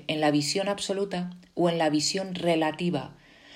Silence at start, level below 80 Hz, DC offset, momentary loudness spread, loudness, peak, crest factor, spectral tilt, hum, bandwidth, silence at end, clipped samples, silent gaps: 0 s; -66 dBFS; under 0.1%; 10 LU; -27 LUFS; -12 dBFS; 16 dB; -4.5 dB/octave; none; 16 kHz; 0 s; under 0.1%; none